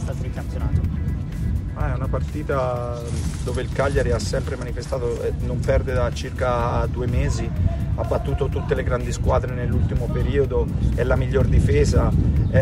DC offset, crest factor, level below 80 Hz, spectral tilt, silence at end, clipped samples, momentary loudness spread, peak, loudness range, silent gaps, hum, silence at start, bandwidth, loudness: under 0.1%; 16 dB; -26 dBFS; -7 dB/octave; 0 s; under 0.1%; 8 LU; -4 dBFS; 4 LU; none; none; 0 s; 12.5 kHz; -23 LUFS